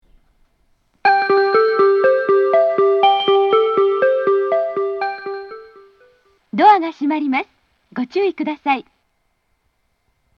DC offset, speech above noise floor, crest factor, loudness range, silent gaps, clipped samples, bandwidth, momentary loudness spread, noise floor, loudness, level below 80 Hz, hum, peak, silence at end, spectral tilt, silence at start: under 0.1%; 50 dB; 16 dB; 5 LU; none; under 0.1%; 5.8 kHz; 13 LU; -67 dBFS; -16 LUFS; -66 dBFS; none; 0 dBFS; 1.55 s; -6 dB/octave; 1.05 s